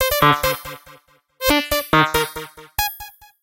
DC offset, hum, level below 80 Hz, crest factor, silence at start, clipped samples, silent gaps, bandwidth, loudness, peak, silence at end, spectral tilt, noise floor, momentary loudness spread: under 0.1%; none; -38 dBFS; 20 dB; 0 s; under 0.1%; none; 17 kHz; -19 LUFS; -2 dBFS; 0.3 s; -3.5 dB/octave; -50 dBFS; 20 LU